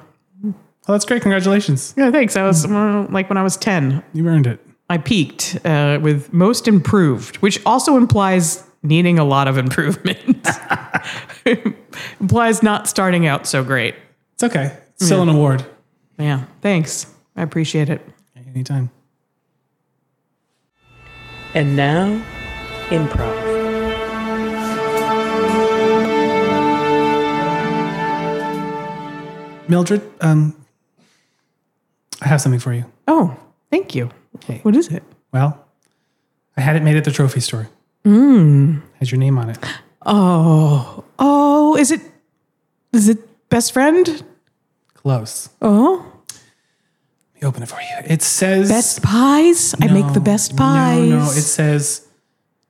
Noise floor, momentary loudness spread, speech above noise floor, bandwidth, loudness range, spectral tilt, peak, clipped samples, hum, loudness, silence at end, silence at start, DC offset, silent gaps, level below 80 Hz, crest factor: -70 dBFS; 14 LU; 55 dB; 15.5 kHz; 7 LU; -5.5 dB/octave; -2 dBFS; under 0.1%; none; -16 LUFS; 0.7 s; 0.4 s; under 0.1%; none; -46 dBFS; 14 dB